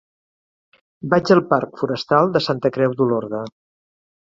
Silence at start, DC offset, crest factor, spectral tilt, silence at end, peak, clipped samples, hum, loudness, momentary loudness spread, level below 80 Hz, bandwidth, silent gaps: 1.05 s; under 0.1%; 18 dB; -7 dB/octave; 0.85 s; -2 dBFS; under 0.1%; none; -19 LUFS; 13 LU; -60 dBFS; 7.6 kHz; none